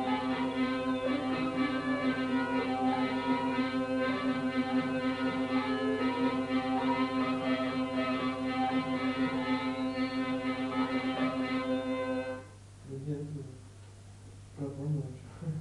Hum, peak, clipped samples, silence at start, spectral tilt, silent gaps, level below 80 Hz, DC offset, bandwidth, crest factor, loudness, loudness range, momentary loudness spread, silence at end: none; -18 dBFS; under 0.1%; 0 s; -6.5 dB/octave; none; -62 dBFS; under 0.1%; 11 kHz; 14 dB; -32 LUFS; 6 LU; 12 LU; 0 s